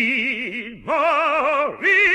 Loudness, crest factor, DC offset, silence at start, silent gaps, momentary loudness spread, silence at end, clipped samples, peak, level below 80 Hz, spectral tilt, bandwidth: -19 LUFS; 12 dB; under 0.1%; 0 s; none; 10 LU; 0 s; under 0.1%; -6 dBFS; -56 dBFS; -3.5 dB/octave; 12.5 kHz